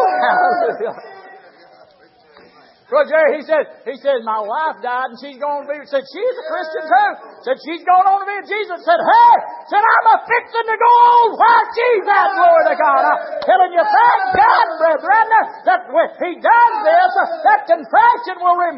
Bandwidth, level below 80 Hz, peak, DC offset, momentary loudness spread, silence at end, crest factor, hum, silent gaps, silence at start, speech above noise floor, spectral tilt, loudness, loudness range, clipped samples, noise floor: 5.8 kHz; -62 dBFS; 0 dBFS; under 0.1%; 11 LU; 0 s; 14 dB; none; none; 0 s; 35 dB; -7.5 dB/octave; -14 LUFS; 8 LU; under 0.1%; -49 dBFS